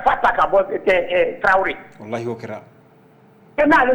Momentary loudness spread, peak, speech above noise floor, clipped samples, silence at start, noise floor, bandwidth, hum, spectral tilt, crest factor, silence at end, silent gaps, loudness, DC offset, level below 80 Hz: 16 LU; -6 dBFS; 32 dB; under 0.1%; 0 s; -50 dBFS; 19 kHz; none; -5.5 dB/octave; 14 dB; 0 s; none; -18 LUFS; under 0.1%; -46 dBFS